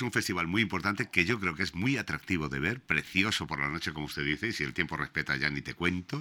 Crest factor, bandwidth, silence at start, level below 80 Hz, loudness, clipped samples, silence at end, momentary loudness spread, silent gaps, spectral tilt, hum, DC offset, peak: 24 dB; 19.5 kHz; 0 s; -54 dBFS; -30 LUFS; under 0.1%; 0 s; 5 LU; none; -4.5 dB/octave; none; under 0.1%; -8 dBFS